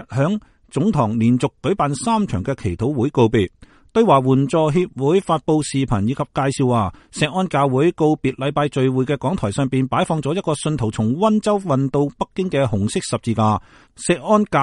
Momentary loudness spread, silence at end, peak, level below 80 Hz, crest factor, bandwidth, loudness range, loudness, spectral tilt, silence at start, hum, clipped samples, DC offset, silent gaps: 6 LU; 0 s; -2 dBFS; -44 dBFS; 18 dB; 11.5 kHz; 2 LU; -19 LUFS; -6.5 dB/octave; 0 s; none; under 0.1%; under 0.1%; none